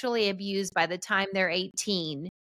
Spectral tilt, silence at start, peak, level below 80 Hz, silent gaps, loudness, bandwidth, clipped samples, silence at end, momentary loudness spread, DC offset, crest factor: -3 dB/octave; 0 s; -10 dBFS; -70 dBFS; none; -28 LUFS; 15 kHz; under 0.1%; 0.2 s; 4 LU; under 0.1%; 20 dB